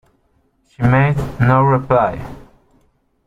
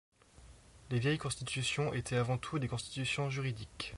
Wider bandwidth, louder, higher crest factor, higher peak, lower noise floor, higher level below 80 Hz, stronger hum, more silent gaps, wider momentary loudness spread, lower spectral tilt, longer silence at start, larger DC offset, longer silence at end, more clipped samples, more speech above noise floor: second, 7.2 kHz vs 11.5 kHz; first, -15 LUFS vs -36 LUFS; about the same, 16 dB vs 18 dB; first, -2 dBFS vs -20 dBFS; about the same, -60 dBFS vs -59 dBFS; first, -38 dBFS vs -58 dBFS; neither; neither; first, 10 LU vs 5 LU; first, -9 dB/octave vs -5 dB/octave; first, 0.8 s vs 0.4 s; neither; first, 0.9 s vs 0 s; neither; first, 46 dB vs 23 dB